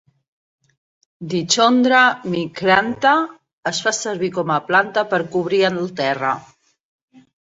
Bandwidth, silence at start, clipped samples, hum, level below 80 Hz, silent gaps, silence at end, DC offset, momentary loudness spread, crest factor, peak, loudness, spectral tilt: 8 kHz; 1.2 s; under 0.1%; none; -62 dBFS; 3.53-3.63 s; 1 s; under 0.1%; 11 LU; 18 dB; -2 dBFS; -18 LUFS; -3.5 dB/octave